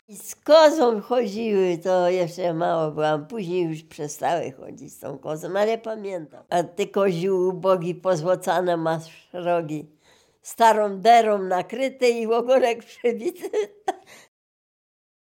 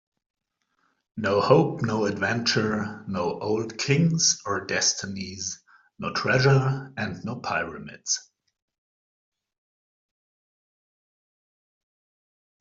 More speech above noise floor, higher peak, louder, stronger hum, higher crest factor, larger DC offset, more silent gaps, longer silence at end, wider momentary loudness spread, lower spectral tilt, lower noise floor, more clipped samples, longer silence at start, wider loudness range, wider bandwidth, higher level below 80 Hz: second, 36 dB vs 48 dB; about the same, -4 dBFS vs -4 dBFS; first, -22 LUFS vs -25 LUFS; neither; about the same, 20 dB vs 22 dB; neither; neither; second, 1.1 s vs 4.4 s; first, 16 LU vs 13 LU; about the same, -5 dB/octave vs -4 dB/octave; second, -58 dBFS vs -72 dBFS; neither; second, 0.1 s vs 1.15 s; second, 6 LU vs 10 LU; first, 17 kHz vs 7.8 kHz; second, -76 dBFS vs -64 dBFS